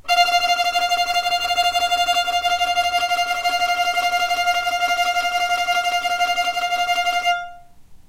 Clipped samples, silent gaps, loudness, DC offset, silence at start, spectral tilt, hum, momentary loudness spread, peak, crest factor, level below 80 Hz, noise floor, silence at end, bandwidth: under 0.1%; none; -19 LUFS; under 0.1%; 0.05 s; 0.5 dB/octave; none; 3 LU; -4 dBFS; 16 dB; -52 dBFS; -43 dBFS; 0.05 s; 16 kHz